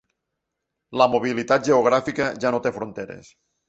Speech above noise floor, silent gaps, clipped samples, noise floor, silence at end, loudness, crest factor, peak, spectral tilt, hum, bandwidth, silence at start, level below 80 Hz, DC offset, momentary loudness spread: 60 dB; none; under 0.1%; -81 dBFS; 0.5 s; -21 LUFS; 20 dB; -2 dBFS; -5 dB/octave; none; 8.2 kHz; 0.9 s; -60 dBFS; under 0.1%; 15 LU